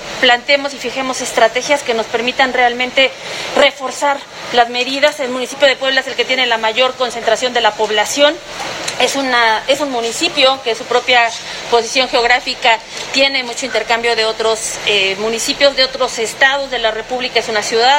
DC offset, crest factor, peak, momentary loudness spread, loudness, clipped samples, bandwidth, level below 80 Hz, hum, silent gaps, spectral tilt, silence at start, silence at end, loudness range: under 0.1%; 14 dB; 0 dBFS; 6 LU; -14 LUFS; under 0.1%; 17 kHz; -50 dBFS; none; none; -1 dB/octave; 0 s; 0 s; 1 LU